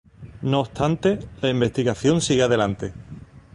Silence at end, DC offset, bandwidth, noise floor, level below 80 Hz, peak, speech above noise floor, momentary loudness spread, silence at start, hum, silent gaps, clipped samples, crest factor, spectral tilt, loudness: 0.15 s; under 0.1%; 11.5 kHz; -41 dBFS; -46 dBFS; -6 dBFS; 20 dB; 14 LU; 0.2 s; none; none; under 0.1%; 18 dB; -5.5 dB/octave; -22 LUFS